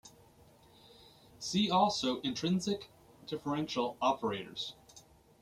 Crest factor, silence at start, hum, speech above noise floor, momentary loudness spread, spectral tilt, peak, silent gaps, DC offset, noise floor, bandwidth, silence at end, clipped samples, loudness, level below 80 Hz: 20 dB; 0.05 s; none; 28 dB; 14 LU; -4.5 dB/octave; -16 dBFS; none; under 0.1%; -62 dBFS; 15 kHz; 0.4 s; under 0.1%; -34 LUFS; -68 dBFS